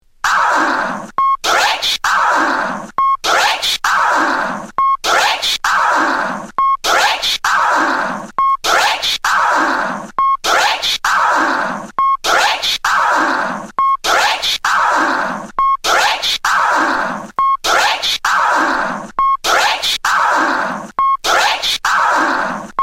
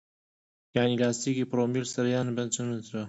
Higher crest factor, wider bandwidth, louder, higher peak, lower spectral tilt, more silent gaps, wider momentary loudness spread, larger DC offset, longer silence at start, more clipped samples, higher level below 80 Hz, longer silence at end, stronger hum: about the same, 14 dB vs 18 dB; first, 16 kHz vs 8.2 kHz; first, -14 LUFS vs -29 LUFS; first, -2 dBFS vs -10 dBFS; second, -1 dB/octave vs -5 dB/octave; neither; about the same, 6 LU vs 5 LU; neither; second, 0.25 s vs 0.75 s; neither; first, -46 dBFS vs -68 dBFS; about the same, 0 s vs 0 s; neither